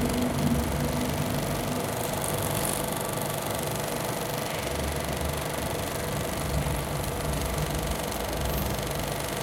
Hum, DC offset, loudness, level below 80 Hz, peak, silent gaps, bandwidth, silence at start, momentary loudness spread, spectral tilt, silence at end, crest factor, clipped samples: none; under 0.1%; -29 LUFS; -38 dBFS; -12 dBFS; none; 17 kHz; 0 s; 3 LU; -4.5 dB/octave; 0 s; 18 dB; under 0.1%